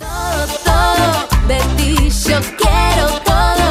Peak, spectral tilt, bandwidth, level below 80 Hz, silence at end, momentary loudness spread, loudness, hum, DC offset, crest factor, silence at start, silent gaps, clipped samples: -2 dBFS; -4 dB/octave; 16 kHz; -18 dBFS; 0 s; 4 LU; -14 LUFS; none; under 0.1%; 10 dB; 0 s; none; under 0.1%